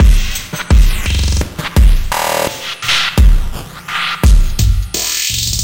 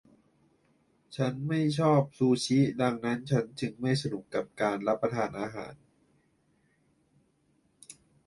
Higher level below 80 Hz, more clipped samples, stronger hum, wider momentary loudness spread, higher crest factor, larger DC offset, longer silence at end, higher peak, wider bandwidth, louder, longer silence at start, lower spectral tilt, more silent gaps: first, -12 dBFS vs -68 dBFS; neither; neither; second, 7 LU vs 17 LU; second, 10 dB vs 22 dB; neither; second, 0 s vs 0.35 s; first, 0 dBFS vs -10 dBFS; first, 17 kHz vs 11.5 kHz; first, -14 LUFS vs -29 LUFS; second, 0 s vs 1.1 s; second, -3.5 dB/octave vs -6.5 dB/octave; neither